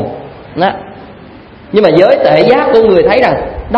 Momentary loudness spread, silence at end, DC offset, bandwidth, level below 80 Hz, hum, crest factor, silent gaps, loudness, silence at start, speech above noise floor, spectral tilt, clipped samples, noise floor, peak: 16 LU; 0 s; under 0.1%; 6.4 kHz; -34 dBFS; none; 10 dB; none; -9 LUFS; 0 s; 26 dB; -7.5 dB/octave; 0.6%; -33 dBFS; 0 dBFS